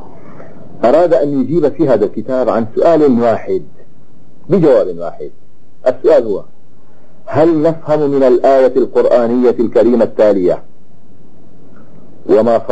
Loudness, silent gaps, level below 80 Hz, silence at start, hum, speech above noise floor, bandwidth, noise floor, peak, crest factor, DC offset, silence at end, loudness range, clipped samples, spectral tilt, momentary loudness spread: -12 LUFS; none; -54 dBFS; 0.3 s; none; 37 dB; 8 kHz; -48 dBFS; 0 dBFS; 12 dB; 8%; 0 s; 4 LU; under 0.1%; -8.5 dB/octave; 11 LU